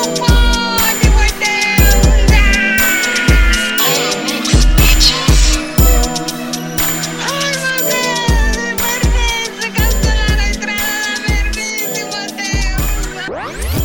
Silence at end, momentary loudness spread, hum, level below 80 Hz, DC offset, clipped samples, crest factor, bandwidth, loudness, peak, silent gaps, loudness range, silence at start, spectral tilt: 0 s; 8 LU; none; -16 dBFS; under 0.1%; under 0.1%; 12 dB; 17 kHz; -13 LUFS; 0 dBFS; none; 5 LU; 0 s; -3.5 dB/octave